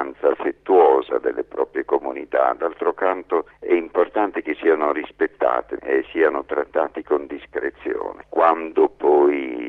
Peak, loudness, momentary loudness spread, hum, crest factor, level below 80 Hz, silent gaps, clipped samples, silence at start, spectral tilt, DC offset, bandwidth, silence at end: -2 dBFS; -21 LUFS; 9 LU; none; 18 dB; -58 dBFS; none; under 0.1%; 0 s; -7 dB/octave; under 0.1%; 4 kHz; 0 s